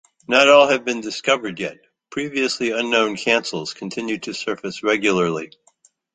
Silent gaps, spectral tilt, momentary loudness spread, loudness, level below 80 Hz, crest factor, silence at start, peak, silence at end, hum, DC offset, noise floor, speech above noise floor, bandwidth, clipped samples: none; -3.5 dB/octave; 15 LU; -19 LUFS; -64 dBFS; 20 dB; 0.3 s; -2 dBFS; 0.7 s; none; under 0.1%; -59 dBFS; 39 dB; 9.4 kHz; under 0.1%